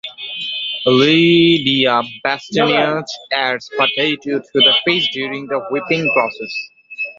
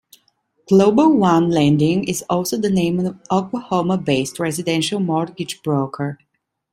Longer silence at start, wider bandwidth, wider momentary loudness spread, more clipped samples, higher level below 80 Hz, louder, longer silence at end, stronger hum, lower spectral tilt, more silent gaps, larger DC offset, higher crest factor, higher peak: second, 0.05 s vs 0.7 s; second, 7.6 kHz vs 16 kHz; first, 13 LU vs 9 LU; neither; about the same, -58 dBFS vs -54 dBFS; first, -15 LUFS vs -18 LUFS; second, 0.05 s vs 0.55 s; neither; about the same, -5 dB/octave vs -6 dB/octave; neither; neither; about the same, 16 dB vs 16 dB; about the same, 0 dBFS vs -2 dBFS